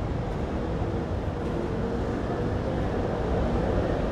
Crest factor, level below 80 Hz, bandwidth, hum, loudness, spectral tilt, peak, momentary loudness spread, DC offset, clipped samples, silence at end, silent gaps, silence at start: 14 dB; -34 dBFS; 10 kHz; none; -29 LUFS; -8 dB/octave; -14 dBFS; 4 LU; under 0.1%; under 0.1%; 0 s; none; 0 s